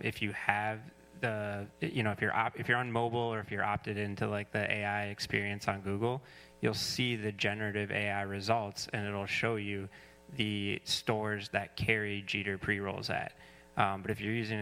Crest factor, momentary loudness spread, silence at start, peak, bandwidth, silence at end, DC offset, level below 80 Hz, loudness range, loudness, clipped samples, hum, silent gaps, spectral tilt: 24 dB; 6 LU; 0 s; -10 dBFS; 16 kHz; 0 s; under 0.1%; -64 dBFS; 1 LU; -34 LUFS; under 0.1%; none; none; -5 dB/octave